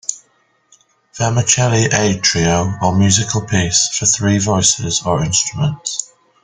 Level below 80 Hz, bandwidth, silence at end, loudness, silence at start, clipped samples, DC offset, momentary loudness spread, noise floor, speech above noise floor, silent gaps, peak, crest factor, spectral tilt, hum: -44 dBFS; 10 kHz; 0.4 s; -15 LUFS; 0.1 s; under 0.1%; under 0.1%; 7 LU; -59 dBFS; 44 dB; none; 0 dBFS; 16 dB; -3.5 dB/octave; none